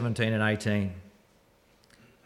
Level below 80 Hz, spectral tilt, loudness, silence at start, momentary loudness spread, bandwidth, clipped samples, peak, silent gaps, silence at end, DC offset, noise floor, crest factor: -64 dBFS; -6.5 dB/octave; -28 LUFS; 0 s; 11 LU; 13 kHz; under 0.1%; -14 dBFS; none; 1.15 s; under 0.1%; -63 dBFS; 16 dB